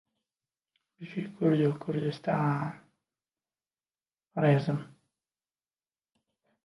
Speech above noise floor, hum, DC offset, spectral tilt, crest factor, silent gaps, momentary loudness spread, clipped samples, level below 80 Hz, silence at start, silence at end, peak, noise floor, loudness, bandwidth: over 62 dB; none; under 0.1%; -9 dB/octave; 20 dB; none; 13 LU; under 0.1%; -74 dBFS; 1 s; 1.8 s; -12 dBFS; under -90 dBFS; -30 LUFS; 11 kHz